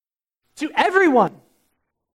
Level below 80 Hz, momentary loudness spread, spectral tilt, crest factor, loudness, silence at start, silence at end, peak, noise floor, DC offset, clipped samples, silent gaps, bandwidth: -66 dBFS; 10 LU; -5 dB/octave; 20 dB; -18 LUFS; 0.6 s; 0.85 s; -2 dBFS; -77 dBFS; under 0.1%; under 0.1%; none; 13 kHz